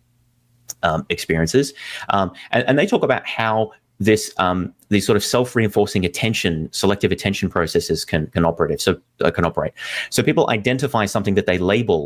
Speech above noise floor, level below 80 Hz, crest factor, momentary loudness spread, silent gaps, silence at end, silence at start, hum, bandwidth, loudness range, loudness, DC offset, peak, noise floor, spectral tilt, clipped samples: 42 dB; -40 dBFS; 16 dB; 5 LU; none; 0 s; 0.7 s; none; 16 kHz; 1 LU; -19 LUFS; under 0.1%; -4 dBFS; -61 dBFS; -5 dB/octave; under 0.1%